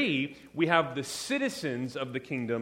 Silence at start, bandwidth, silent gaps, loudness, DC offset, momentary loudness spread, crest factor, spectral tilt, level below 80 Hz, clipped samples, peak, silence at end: 0 s; 16.5 kHz; none; -31 LUFS; under 0.1%; 9 LU; 24 dB; -4.5 dB/octave; -68 dBFS; under 0.1%; -8 dBFS; 0 s